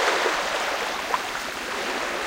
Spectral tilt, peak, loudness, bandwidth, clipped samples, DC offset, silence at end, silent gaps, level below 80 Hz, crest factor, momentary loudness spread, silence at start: -1 dB/octave; -8 dBFS; -25 LUFS; 16 kHz; under 0.1%; under 0.1%; 0 s; none; -54 dBFS; 18 dB; 6 LU; 0 s